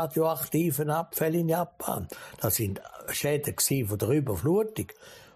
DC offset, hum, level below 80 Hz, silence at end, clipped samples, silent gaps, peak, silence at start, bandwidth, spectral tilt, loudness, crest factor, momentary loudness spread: under 0.1%; none; -56 dBFS; 0.1 s; under 0.1%; none; -14 dBFS; 0 s; 15.5 kHz; -5 dB/octave; -28 LUFS; 16 dB; 8 LU